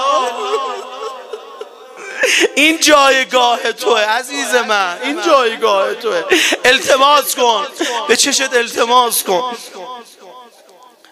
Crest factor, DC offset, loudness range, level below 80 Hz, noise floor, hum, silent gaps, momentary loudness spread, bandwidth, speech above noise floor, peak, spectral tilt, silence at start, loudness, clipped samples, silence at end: 14 dB; under 0.1%; 3 LU; -60 dBFS; -44 dBFS; none; none; 20 LU; 16.5 kHz; 31 dB; 0 dBFS; -0.5 dB/octave; 0 s; -13 LUFS; under 0.1%; 0.7 s